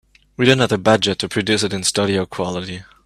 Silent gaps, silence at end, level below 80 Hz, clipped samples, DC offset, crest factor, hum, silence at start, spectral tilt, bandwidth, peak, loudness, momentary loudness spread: none; 0.25 s; -52 dBFS; under 0.1%; under 0.1%; 18 dB; none; 0.4 s; -4 dB/octave; 14.5 kHz; 0 dBFS; -18 LUFS; 9 LU